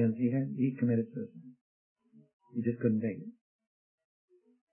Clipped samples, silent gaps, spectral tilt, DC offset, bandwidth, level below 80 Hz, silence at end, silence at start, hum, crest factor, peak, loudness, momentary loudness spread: under 0.1%; 1.61-1.96 s, 2.33-2.40 s; -13 dB/octave; under 0.1%; 3 kHz; -80 dBFS; 1.4 s; 0 s; none; 18 dB; -16 dBFS; -33 LUFS; 16 LU